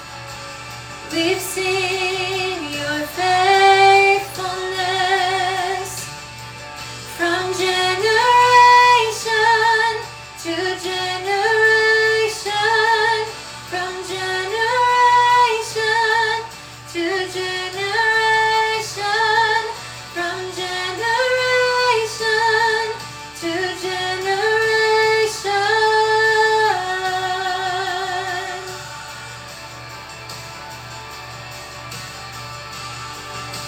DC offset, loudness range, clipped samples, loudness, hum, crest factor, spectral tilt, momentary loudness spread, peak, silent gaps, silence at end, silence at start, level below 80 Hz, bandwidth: under 0.1%; 12 LU; under 0.1%; -17 LUFS; none; 18 dB; -2.5 dB/octave; 19 LU; -2 dBFS; none; 0 s; 0 s; -52 dBFS; over 20 kHz